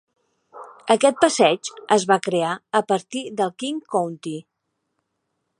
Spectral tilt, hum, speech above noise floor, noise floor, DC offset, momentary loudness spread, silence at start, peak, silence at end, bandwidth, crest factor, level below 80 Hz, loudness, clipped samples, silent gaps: -3.5 dB/octave; none; 56 dB; -77 dBFS; under 0.1%; 13 LU; 0.55 s; 0 dBFS; 1.2 s; 11.5 kHz; 22 dB; -74 dBFS; -21 LUFS; under 0.1%; none